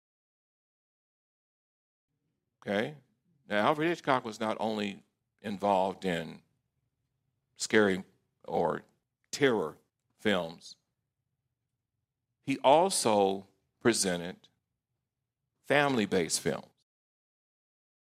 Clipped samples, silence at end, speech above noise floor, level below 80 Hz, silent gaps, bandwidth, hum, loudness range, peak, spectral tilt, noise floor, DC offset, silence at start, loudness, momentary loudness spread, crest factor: under 0.1%; 1.45 s; 58 dB; -76 dBFS; none; 16 kHz; none; 6 LU; -10 dBFS; -4 dB/octave; -87 dBFS; under 0.1%; 2.65 s; -30 LUFS; 15 LU; 24 dB